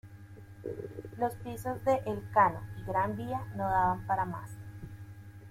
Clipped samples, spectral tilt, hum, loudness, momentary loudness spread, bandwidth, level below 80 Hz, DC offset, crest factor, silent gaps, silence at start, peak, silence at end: under 0.1%; -7.5 dB/octave; none; -32 LUFS; 20 LU; 16.5 kHz; -56 dBFS; under 0.1%; 20 dB; none; 0.05 s; -12 dBFS; 0 s